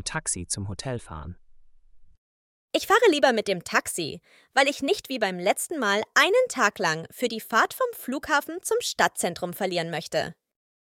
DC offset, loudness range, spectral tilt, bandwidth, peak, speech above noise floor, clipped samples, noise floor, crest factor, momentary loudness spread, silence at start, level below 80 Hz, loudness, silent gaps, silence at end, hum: under 0.1%; 3 LU; -3 dB/octave; 17.5 kHz; -4 dBFS; 25 dB; under 0.1%; -51 dBFS; 22 dB; 13 LU; 0 s; -58 dBFS; -25 LUFS; 2.18-2.68 s; 0.65 s; none